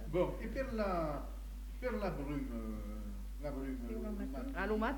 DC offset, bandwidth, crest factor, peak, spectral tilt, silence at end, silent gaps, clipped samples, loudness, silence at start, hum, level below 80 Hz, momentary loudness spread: under 0.1%; 19 kHz; 18 dB; -20 dBFS; -7 dB/octave; 0 s; none; under 0.1%; -41 LUFS; 0 s; none; -44 dBFS; 10 LU